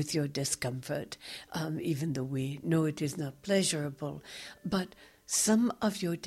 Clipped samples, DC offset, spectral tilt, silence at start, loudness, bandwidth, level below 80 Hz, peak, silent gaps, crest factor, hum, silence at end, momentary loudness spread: under 0.1%; under 0.1%; -4.5 dB/octave; 0 s; -32 LUFS; 16 kHz; -64 dBFS; -14 dBFS; none; 18 dB; none; 0 s; 13 LU